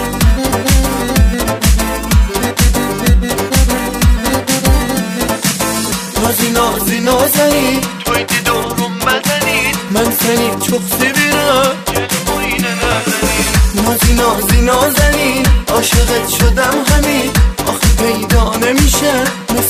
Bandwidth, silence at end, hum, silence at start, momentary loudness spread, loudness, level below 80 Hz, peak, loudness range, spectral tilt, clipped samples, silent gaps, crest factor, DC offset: 15.5 kHz; 0 s; none; 0 s; 4 LU; -12 LUFS; -18 dBFS; 0 dBFS; 2 LU; -4 dB/octave; under 0.1%; none; 12 dB; under 0.1%